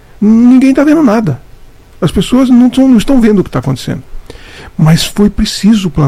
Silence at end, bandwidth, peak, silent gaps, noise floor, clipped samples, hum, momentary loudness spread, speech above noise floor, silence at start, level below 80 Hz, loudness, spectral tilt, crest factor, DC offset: 0 s; 15.5 kHz; 0 dBFS; none; -34 dBFS; 3%; none; 11 LU; 27 dB; 0.2 s; -26 dBFS; -8 LUFS; -6.5 dB/octave; 8 dB; under 0.1%